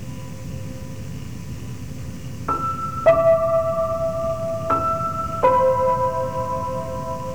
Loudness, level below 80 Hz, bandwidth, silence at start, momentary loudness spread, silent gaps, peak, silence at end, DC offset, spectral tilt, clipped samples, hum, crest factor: -21 LUFS; -42 dBFS; over 20 kHz; 0 s; 17 LU; none; -4 dBFS; 0 s; 1%; -7 dB/octave; under 0.1%; none; 18 dB